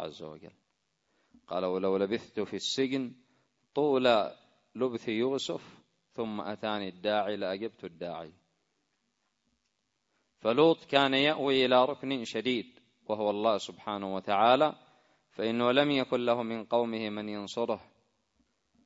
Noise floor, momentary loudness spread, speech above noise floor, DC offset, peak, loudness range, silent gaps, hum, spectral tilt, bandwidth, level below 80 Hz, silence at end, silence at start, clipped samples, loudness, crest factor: -80 dBFS; 16 LU; 50 dB; under 0.1%; -8 dBFS; 8 LU; none; none; -5 dB/octave; 8 kHz; -74 dBFS; 1.05 s; 0 s; under 0.1%; -30 LUFS; 24 dB